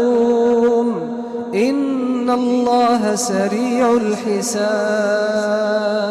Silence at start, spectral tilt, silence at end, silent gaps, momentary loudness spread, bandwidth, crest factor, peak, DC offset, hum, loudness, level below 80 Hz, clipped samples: 0 s; -4.5 dB/octave; 0 s; none; 5 LU; 14 kHz; 10 dB; -8 dBFS; under 0.1%; none; -17 LUFS; -58 dBFS; under 0.1%